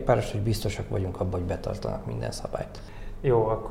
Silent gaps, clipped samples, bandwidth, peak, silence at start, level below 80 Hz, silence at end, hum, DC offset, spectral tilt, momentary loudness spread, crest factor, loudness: none; under 0.1%; 16 kHz; -10 dBFS; 0 s; -40 dBFS; 0 s; none; under 0.1%; -6.5 dB/octave; 11 LU; 18 dB; -29 LUFS